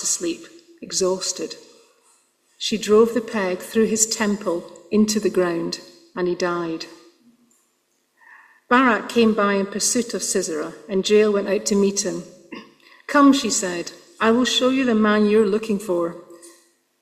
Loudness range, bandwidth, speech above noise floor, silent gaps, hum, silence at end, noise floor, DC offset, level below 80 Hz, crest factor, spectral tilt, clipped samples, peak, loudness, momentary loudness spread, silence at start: 5 LU; 15.5 kHz; 48 dB; none; none; 0.5 s; -67 dBFS; under 0.1%; -62 dBFS; 20 dB; -3.5 dB/octave; under 0.1%; -2 dBFS; -20 LUFS; 16 LU; 0 s